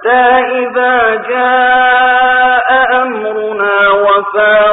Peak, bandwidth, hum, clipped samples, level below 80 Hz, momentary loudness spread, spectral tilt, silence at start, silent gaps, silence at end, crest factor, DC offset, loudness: 0 dBFS; 4 kHz; none; under 0.1%; -48 dBFS; 5 LU; -8.5 dB/octave; 0 s; none; 0 s; 8 dB; under 0.1%; -9 LUFS